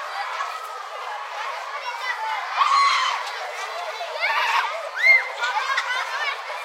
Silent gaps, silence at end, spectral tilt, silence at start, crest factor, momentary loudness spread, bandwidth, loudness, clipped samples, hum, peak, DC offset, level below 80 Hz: none; 0 s; 6.5 dB/octave; 0 s; 18 dB; 13 LU; 16 kHz; -22 LUFS; under 0.1%; none; -6 dBFS; under 0.1%; under -90 dBFS